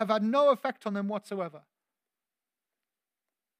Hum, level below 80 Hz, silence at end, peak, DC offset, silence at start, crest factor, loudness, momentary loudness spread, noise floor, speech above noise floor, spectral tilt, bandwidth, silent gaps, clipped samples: none; under -90 dBFS; 2 s; -12 dBFS; under 0.1%; 0 s; 20 dB; -29 LUFS; 13 LU; under -90 dBFS; over 61 dB; -6.5 dB/octave; 14.5 kHz; none; under 0.1%